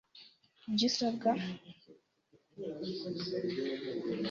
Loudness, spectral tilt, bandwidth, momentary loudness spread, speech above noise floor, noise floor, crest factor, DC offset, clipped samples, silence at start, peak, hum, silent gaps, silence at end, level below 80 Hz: -35 LUFS; -4 dB/octave; 7.6 kHz; 20 LU; 35 dB; -71 dBFS; 20 dB; under 0.1%; under 0.1%; 0.15 s; -18 dBFS; none; none; 0 s; -74 dBFS